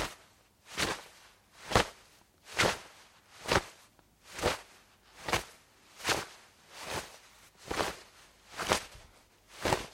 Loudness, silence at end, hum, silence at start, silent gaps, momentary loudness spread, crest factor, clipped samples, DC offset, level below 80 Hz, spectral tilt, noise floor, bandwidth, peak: -34 LUFS; 0 s; none; 0 s; none; 24 LU; 30 dB; under 0.1%; under 0.1%; -54 dBFS; -3 dB/octave; -63 dBFS; 16.5 kHz; -8 dBFS